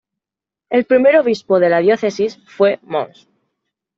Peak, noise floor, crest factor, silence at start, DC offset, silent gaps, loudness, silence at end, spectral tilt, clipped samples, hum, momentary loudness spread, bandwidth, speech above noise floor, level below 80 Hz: -2 dBFS; -87 dBFS; 14 dB; 0.7 s; under 0.1%; none; -15 LUFS; 0.9 s; -6 dB/octave; under 0.1%; none; 11 LU; 7.6 kHz; 72 dB; -64 dBFS